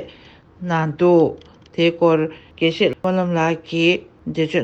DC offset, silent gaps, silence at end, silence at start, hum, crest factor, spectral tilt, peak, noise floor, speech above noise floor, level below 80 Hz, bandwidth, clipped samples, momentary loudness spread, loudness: under 0.1%; none; 0 s; 0 s; none; 16 dB; -6.5 dB/octave; -4 dBFS; -46 dBFS; 28 dB; -56 dBFS; 7.8 kHz; under 0.1%; 13 LU; -19 LUFS